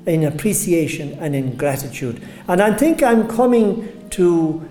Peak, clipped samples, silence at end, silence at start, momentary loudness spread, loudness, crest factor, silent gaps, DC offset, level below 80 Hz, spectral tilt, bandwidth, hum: -2 dBFS; under 0.1%; 0 s; 0 s; 12 LU; -18 LUFS; 16 dB; none; under 0.1%; -46 dBFS; -6 dB/octave; 17.5 kHz; none